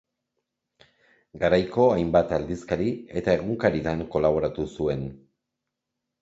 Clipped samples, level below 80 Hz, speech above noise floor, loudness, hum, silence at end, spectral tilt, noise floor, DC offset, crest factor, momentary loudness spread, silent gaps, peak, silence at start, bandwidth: under 0.1%; -48 dBFS; 60 dB; -25 LUFS; none; 1.05 s; -7.5 dB/octave; -84 dBFS; under 0.1%; 20 dB; 8 LU; none; -6 dBFS; 1.35 s; 8 kHz